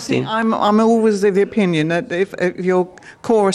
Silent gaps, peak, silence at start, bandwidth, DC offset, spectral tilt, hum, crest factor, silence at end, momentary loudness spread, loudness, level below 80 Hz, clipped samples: none; -4 dBFS; 0 s; 12.5 kHz; under 0.1%; -6 dB/octave; none; 12 dB; 0 s; 6 LU; -17 LUFS; -56 dBFS; under 0.1%